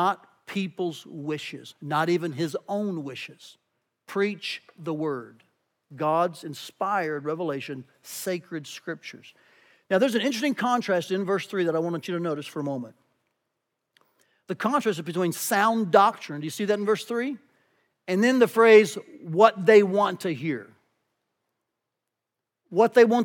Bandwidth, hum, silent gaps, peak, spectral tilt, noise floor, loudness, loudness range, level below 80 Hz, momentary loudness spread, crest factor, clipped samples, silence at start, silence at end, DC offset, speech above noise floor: 19 kHz; none; none; -2 dBFS; -5 dB/octave; -85 dBFS; -25 LUFS; 11 LU; under -90 dBFS; 18 LU; 24 dB; under 0.1%; 0 s; 0 s; under 0.1%; 61 dB